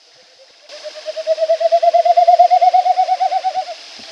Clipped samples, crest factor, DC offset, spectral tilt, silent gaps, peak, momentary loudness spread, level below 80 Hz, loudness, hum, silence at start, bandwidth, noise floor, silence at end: under 0.1%; 14 dB; under 0.1%; 0.5 dB/octave; none; 0 dBFS; 19 LU; -82 dBFS; -14 LUFS; none; 0.7 s; 8.2 kHz; -47 dBFS; 0 s